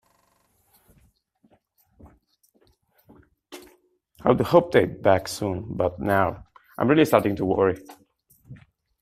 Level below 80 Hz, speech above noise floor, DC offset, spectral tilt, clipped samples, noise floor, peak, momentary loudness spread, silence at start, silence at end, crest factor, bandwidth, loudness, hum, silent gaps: -54 dBFS; 45 dB; under 0.1%; -6.5 dB/octave; under 0.1%; -66 dBFS; -2 dBFS; 25 LU; 3.5 s; 0.45 s; 24 dB; 16 kHz; -22 LUFS; none; none